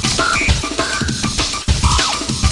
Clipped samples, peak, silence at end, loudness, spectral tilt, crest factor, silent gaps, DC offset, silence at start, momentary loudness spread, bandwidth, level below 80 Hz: under 0.1%; 0 dBFS; 0 s; -16 LUFS; -3 dB/octave; 16 dB; none; under 0.1%; 0 s; 4 LU; 11.5 kHz; -24 dBFS